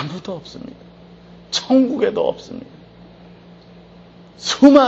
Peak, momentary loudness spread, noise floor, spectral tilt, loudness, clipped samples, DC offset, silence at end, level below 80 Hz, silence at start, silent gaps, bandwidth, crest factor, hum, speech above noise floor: 0 dBFS; 23 LU; -44 dBFS; -4.5 dB/octave; -18 LUFS; under 0.1%; under 0.1%; 0 s; -54 dBFS; 0 s; none; 8 kHz; 18 dB; none; 28 dB